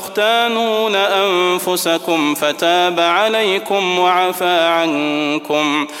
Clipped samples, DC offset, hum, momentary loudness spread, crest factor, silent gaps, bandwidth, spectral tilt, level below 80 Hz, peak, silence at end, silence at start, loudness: under 0.1%; under 0.1%; none; 3 LU; 14 dB; none; 16.5 kHz; -3 dB/octave; -72 dBFS; 0 dBFS; 0 s; 0 s; -15 LUFS